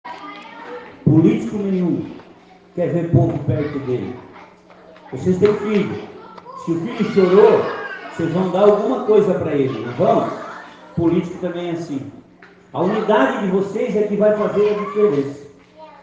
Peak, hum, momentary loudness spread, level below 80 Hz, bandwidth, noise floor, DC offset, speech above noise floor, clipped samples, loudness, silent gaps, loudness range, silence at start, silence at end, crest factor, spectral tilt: 0 dBFS; none; 19 LU; -54 dBFS; 7.8 kHz; -46 dBFS; under 0.1%; 29 dB; under 0.1%; -18 LUFS; none; 6 LU; 0.05 s; 0.15 s; 18 dB; -8.5 dB/octave